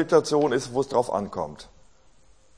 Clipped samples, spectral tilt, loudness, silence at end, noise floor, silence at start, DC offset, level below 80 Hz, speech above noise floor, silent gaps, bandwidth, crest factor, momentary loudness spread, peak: under 0.1%; -5 dB/octave; -25 LUFS; 0.95 s; -59 dBFS; 0 s; 0.2%; -58 dBFS; 35 dB; none; 10.5 kHz; 20 dB; 14 LU; -6 dBFS